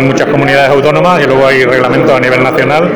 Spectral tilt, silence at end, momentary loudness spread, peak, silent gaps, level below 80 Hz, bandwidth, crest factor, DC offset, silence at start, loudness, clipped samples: -6 dB/octave; 0 s; 2 LU; 0 dBFS; none; -38 dBFS; over 20 kHz; 8 dB; 1%; 0 s; -7 LUFS; under 0.1%